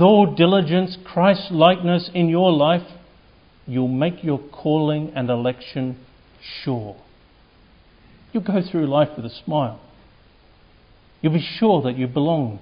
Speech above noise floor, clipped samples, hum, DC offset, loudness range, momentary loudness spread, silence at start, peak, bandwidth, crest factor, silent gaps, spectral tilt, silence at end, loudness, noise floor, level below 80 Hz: 33 dB; under 0.1%; none; under 0.1%; 9 LU; 13 LU; 0 s; 0 dBFS; 5.4 kHz; 20 dB; none; -11 dB/octave; 0.05 s; -20 LUFS; -52 dBFS; -56 dBFS